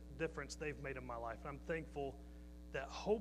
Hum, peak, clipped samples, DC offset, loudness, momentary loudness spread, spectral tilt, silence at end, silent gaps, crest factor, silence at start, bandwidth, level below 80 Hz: none; -26 dBFS; under 0.1%; under 0.1%; -46 LUFS; 7 LU; -5.5 dB/octave; 0 s; none; 20 dB; 0 s; 15 kHz; -56 dBFS